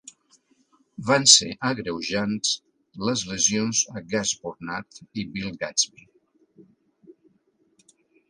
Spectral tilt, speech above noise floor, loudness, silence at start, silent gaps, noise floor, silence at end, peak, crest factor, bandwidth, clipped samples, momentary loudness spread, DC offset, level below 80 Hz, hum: -2 dB/octave; 42 dB; -22 LUFS; 1 s; none; -66 dBFS; 1.7 s; 0 dBFS; 26 dB; 11.5 kHz; under 0.1%; 19 LU; under 0.1%; -62 dBFS; none